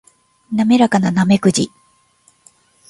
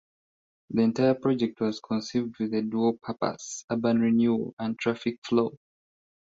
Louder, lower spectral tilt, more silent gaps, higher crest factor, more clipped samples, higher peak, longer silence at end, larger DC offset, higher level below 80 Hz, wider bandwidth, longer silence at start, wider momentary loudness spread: first, -15 LUFS vs -27 LUFS; about the same, -5.5 dB/octave vs -6 dB/octave; second, none vs 3.64-3.68 s, 4.53-4.57 s, 5.18-5.22 s; about the same, 16 dB vs 18 dB; neither; first, 0 dBFS vs -10 dBFS; first, 1.2 s vs 0.85 s; neither; first, -54 dBFS vs -66 dBFS; first, 11.5 kHz vs 7.8 kHz; second, 0.5 s vs 0.7 s; about the same, 10 LU vs 8 LU